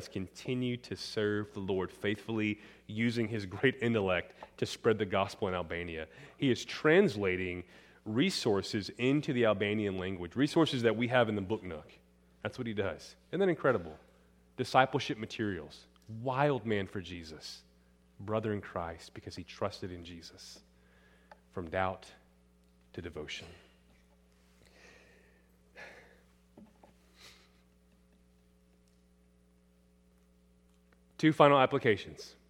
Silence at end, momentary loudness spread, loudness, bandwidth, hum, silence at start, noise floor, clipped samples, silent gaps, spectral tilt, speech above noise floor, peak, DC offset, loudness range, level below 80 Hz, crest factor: 0.15 s; 20 LU; -33 LUFS; 16 kHz; 60 Hz at -65 dBFS; 0 s; -66 dBFS; under 0.1%; none; -6 dB/octave; 33 dB; -8 dBFS; under 0.1%; 12 LU; -66 dBFS; 26 dB